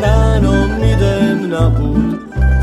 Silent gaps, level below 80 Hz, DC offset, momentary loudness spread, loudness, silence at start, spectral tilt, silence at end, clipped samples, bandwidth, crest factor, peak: none; -16 dBFS; under 0.1%; 4 LU; -14 LUFS; 0 s; -7.5 dB/octave; 0 s; under 0.1%; 11 kHz; 12 dB; 0 dBFS